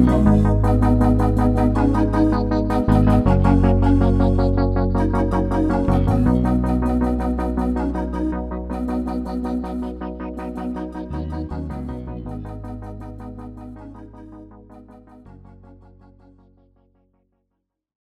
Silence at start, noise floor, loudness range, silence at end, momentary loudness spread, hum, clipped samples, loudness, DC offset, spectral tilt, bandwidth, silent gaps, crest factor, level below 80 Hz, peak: 0 s; -76 dBFS; 18 LU; 3.2 s; 18 LU; none; under 0.1%; -20 LUFS; under 0.1%; -9.5 dB/octave; 10.5 kHz; none; 18 dB; -26 dBFS; -2 dBFS